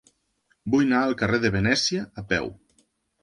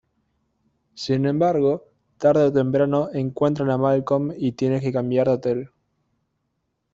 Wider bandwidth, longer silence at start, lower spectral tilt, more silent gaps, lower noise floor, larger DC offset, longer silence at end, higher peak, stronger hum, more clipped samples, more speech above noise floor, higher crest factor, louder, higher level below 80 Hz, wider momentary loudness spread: first, 11 kHz vs 7.8 kHz; second, 0.65 s vs 0.95 s; second, -4.5 dB/octave vs -8 dB/octave; neither; second, -69 dBFS vs -75 dBFS; neither; second, 0.7 s vs 1.25 s; about the same, -6 dBFS vs -6 dBFS; neither; neither; second, 46 dB vs 54 dB; about the same, 18 dB vs 16 dB; about the same, -23 LUFS vs -21 LUFS; first, -48 dBFS vs -60 dBFS; about the same, 9 LU vs 8 LU